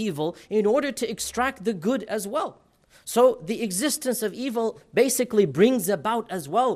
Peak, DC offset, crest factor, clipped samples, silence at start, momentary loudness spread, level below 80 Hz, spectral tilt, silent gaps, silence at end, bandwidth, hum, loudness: -6 dBFS; under 0.1%; 18 dB; under 0.1%; 0 s; 8 LU; -60 dBFS; -4 dB/octave; none; 0 s; 15.5 kHz; none; -24 LUFS